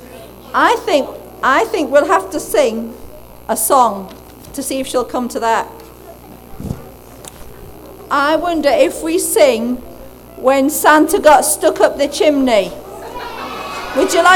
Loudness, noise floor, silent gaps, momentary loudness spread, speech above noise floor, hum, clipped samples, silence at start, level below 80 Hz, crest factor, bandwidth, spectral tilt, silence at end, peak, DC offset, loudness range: -14 LUFS; -36 dBFS; none; 19 LU; 23 dB; 60 Hz at -45 dBFS; under 0.1%; 0 s; -42 dBFS; 16 dB; 19.5 kHz; -3 dB/octave; 0 s; 0 dBFS; under 0.1%; 9 LU